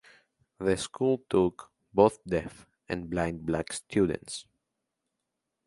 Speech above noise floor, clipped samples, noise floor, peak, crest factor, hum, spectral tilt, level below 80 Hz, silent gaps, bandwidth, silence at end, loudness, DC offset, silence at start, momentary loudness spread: 56 dB; under 0.1%; -84 dBFS; -6 dBFS; 24 dB; none; -5.5 dB/octave; -54 dBFS; none; 11.5 kHz; 1.25 s; -29 LUFS; under 0.1%; 0.6 s; 13 LU